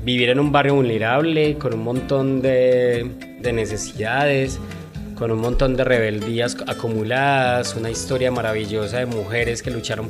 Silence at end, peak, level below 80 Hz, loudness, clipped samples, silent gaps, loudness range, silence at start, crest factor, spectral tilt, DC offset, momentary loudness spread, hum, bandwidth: 0 s; -2 dBFS; -36 dBFS; -20 LUFS; under 0.1%; none; 3 LU; 0 s; 18 dB; -5.5 dB/octave; under 0.1%; 9 LU; none; 14.5 kHz